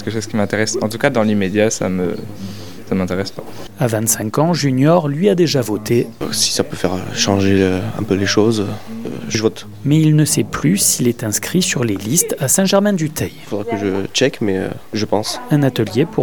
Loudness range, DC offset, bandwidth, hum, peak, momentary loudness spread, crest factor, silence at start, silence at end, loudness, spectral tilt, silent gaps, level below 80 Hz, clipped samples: 3 LU; 2%; 19 kHz; none; 0 dBFS; 10 LU; 16 dB; 0 s; 0 s; -16 LUFS; -4.5 dB/octave; none; -50 dBFS; under 0.1%